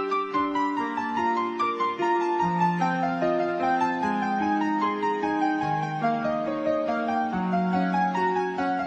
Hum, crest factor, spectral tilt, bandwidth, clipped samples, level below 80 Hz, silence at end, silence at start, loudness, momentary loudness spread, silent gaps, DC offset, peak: none; 14 dB; -7 dB/octave; 8.8 kHz; under 0.1%; -62 dBFS; 0 s; 0 s; -25 LUFS; 3 LU; none; under 0.1%; -12 dBFS